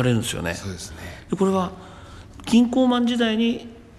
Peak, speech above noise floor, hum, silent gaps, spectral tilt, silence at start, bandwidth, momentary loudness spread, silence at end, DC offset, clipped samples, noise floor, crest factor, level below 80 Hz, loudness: -6 dBFS; 20 dB; none; none; -5.5 dB/octave; 0 s; 13 kHz; 21 LU; 0.15 s; under 0.1%; under 0.1%; -41 dBFS; 16 dB; -48 dBFS; -22 LUFS